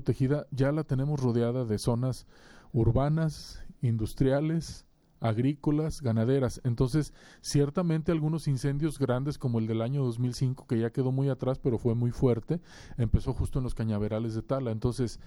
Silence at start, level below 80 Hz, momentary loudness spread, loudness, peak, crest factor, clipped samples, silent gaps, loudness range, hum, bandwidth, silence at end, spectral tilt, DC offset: 0 s; -42 dBFS; 7 LU; -29 LUFS; -12 dBFS; 16 dB; under 0.1%; none; 1 LU; none; 12.5 kHz; 0 s; -7.5 dB/octave; under 0.1%